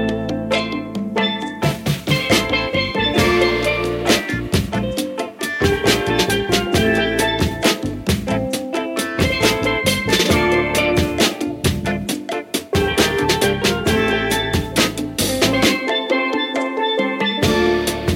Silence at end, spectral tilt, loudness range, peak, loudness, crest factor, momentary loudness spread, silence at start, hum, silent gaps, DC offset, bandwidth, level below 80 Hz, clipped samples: 0 s; -4 dB/octave; 1 LU; 0 dBFS; -18 LUFS; 18 dB; 6 LU; 0 s; none; none; under 0.1%; 17 kHz; -34 dBFS; under 0.1%